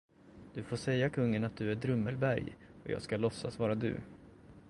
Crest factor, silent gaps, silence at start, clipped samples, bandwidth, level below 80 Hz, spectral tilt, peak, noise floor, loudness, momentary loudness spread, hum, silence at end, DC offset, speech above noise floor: 18 dB; none; 0.25 s; under 0.1%; 11.5 kHz; -62 dBFS; -7 dB/octave; -18 dBFS; -56 dBFS; -35 LUFS; 14 LU; none; 0.1 s; under 0.1%; 22 dB